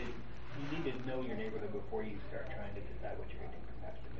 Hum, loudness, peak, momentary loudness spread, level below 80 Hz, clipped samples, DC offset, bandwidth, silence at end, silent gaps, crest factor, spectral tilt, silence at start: none; -44 LUFS; -26 dBFS; 9 LU; -52 dBFS; under 0.1%; 1%; 7.4 kHz; 0 s; none; 16 dB; -5.5 dB/octave; 0 s